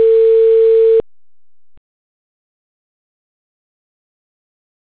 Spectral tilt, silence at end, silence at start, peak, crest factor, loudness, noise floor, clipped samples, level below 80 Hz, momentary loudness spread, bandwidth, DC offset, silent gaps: -8.5 dB/octave; 4 s; 0 s; -6 dBFS; 10 dB; -10 LUFS; under -90 dBFS; under 0.1%; -58 dBFS; 3 LU; 4 kHz; 0.7%; none